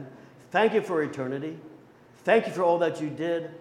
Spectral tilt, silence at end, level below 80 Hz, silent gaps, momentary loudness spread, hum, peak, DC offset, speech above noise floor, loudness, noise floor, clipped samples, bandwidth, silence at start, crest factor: -6 dB/octave; 0 s; -74 dBFS; none; 12 LU; none; -8 dBFS; under 0.1%; 28 dB; -26 LUFS; -53 dBFS; under 0.1%; 12 kHz; 0 s; 20 dB